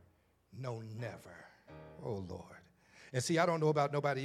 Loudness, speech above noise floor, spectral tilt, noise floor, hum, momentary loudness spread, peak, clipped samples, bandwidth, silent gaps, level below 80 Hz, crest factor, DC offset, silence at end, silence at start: -36 LUFS; 35 dB; -5.5 dB/octave; -70 dBFS; none; 24 LU; -16 dBFS; under 0.1%; 14 kHz; none; -76 dBFS; 22 dB; under 0.1%; 0 s; 0.55 s